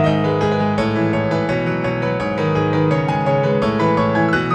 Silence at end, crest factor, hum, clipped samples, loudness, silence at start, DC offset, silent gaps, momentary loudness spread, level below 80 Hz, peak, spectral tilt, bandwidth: 0 s; 14 dB; none; under 0.1%; -18 LUFS; 0 s; under 0.1%; none; 4 LU; -42 dBFS; -4 dBFS; -7.5 dB/octave; 9 kHz